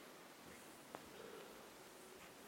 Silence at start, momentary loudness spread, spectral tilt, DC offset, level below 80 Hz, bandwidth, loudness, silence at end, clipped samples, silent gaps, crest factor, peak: 0 s; 3 LU; -3 dB/octave; under 0.1%; -82 dBFS; 16.5 kHz; -57 LUFS; 0 s; under 0.1%; none; 26 dB; -32 dBFS